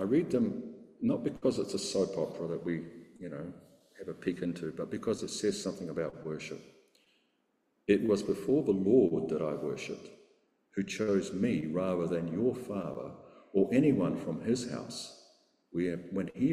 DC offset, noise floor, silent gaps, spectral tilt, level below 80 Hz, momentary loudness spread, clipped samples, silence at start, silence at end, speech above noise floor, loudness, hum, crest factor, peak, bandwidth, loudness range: under 0.1%; -76 dBFS; none; -6 dB/octave; -66 dBFS; 15 LU; under 0.1%; 0 s; 0 s; 45 dB; -33 LUFS; none; 20 dB; -14 dBFS; 13.5 kHz; 6 LU